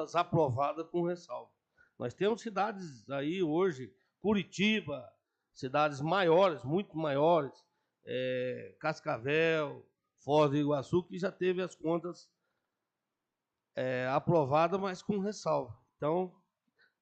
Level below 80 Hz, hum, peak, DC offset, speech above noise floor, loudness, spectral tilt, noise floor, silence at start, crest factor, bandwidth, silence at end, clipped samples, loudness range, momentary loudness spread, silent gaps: -72 dBFS; none; -14 dBFS; under 0.1%; 57 dB; -32 LUFS; -6.5 dB/octave; -89 dBFS; 0 s; 18 dB; 8.6 kHz; 0.7 s; under 0.1%; 4 LU; 15 LU; none